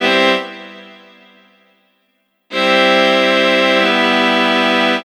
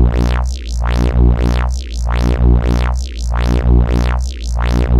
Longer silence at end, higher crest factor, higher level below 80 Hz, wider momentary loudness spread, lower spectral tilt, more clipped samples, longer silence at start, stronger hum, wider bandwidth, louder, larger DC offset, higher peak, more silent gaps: about the same, 0.05 s vs 0 s; first, 16 dB vs 10 dB; second, -62 dBFS vs -14 dBFS; first, 12 LU vs 7 LU; second, -3.5 dB/octave vs -7 dB/octave; neither; about the same, 0 s vs 0 s; neither; first, 14 kHz vs 8.8 kHz; first, -12 LUFS vs -16 LUFS; neither; about the same, 0 dBFS vs -2 dBFS; neither